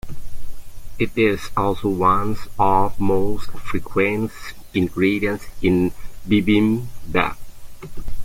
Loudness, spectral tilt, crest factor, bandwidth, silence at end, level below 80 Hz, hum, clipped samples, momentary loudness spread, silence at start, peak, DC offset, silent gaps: -21 LUFS; -7 dB/octave; 16 dB; 16 kHz; 0 s; -36 dBFS; none; under 0.1%; 19 LU; 0.05 s; -4 dBFS; under 0.1%; none